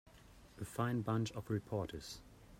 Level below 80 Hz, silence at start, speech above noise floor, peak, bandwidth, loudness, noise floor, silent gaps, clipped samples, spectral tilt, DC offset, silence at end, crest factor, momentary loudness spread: -64 dBFS; 0.15 s; 21 dB; -24 dBFS; 16 kHz; -41 LUFS; -61 dBFS; none; under 0.1%; -6.5 dB/octave; under 0.1%; 0 s; 18 dB; 14 LU